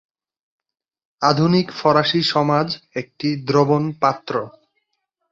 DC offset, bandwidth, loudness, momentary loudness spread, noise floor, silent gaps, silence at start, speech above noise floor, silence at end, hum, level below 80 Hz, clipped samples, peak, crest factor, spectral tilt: under 0.1%; 7.8 kHz; -19 LUFS; 10 LU; -74 dBFS; none; 1.2 s; 56 dB; 0.8 s; none; -60 dBFS; under 0.1%; -2 dBFS; 18 dB; -6.5 dB/octave